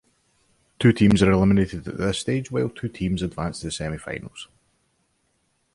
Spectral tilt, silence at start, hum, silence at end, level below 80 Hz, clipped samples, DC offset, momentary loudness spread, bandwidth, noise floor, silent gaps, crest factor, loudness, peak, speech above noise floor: -6.5 dB/octave; 0.8 s; none; 1.3 s; -42 dBFS; under 0.1%; under 0.1%; 16 LU; 11.5 kHz; -69 dBFS; none; 20 dB; -23 LUFS; -4 dBFS; 48 dB